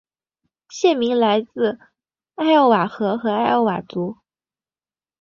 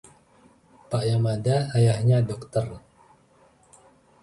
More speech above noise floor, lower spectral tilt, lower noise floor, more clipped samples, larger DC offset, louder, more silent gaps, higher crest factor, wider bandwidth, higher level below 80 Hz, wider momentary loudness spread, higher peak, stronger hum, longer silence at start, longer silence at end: first, over 72 dB vs 36 dB; second, -5.5 dB/octave vs -7 dB/octave; first, under -90 dBFS vs -58 dBFS; neither; neither; first, -19 LUFS vs -24 LUFS; neither; about the same, 18 dB vs 16 dB; second, 7.4 kHz vs 11.5 kHz; second, -66 dBFS vs -54 dBFS; about the same, 12 LU vs 10 LU; first, -2 dBFS vs -10 dBFS; neither; second, 0.7 s vs 0.9 s; second, 1.1 s vs 1.45 s